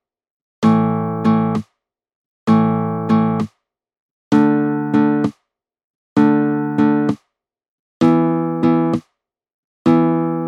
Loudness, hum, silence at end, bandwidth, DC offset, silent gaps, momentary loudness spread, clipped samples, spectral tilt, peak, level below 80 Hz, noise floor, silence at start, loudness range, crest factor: -17 LUFS; none; 0 s; 8 kHz; under 0.1%; 2.15-2.46 s, 3.99-4.31 s, 5.84-6.16 s, 7.68-8.00 s, 9.54-9.85 s; 7 LU; under 0.1%; -9 dB/octave; -2 dBFS; -62 dBFS; -71 dBFS; 0.6 s; 2 LU; 16 dB